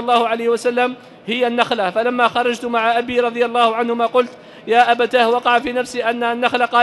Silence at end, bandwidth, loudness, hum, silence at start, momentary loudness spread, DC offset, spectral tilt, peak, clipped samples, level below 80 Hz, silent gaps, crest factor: 0 s; 12 kHz; -17 LUFS; none; 0 s; 6 LU; under 0.1%; -3.5 dB/octave; -2 dBFS; under 0.1%; -60 dBFS; none; 16 dB